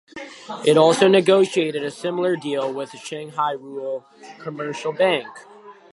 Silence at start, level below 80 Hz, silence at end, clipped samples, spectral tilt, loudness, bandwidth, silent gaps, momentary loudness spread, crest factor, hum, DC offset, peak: 0.15 s; -74 dBFS; 0.2 s; under 0.1%; -5 dB/octave; -20 LUFS; 11.5 kHz; none; 19 LU; 20 dB; none; under 0.1%; -2 dBFS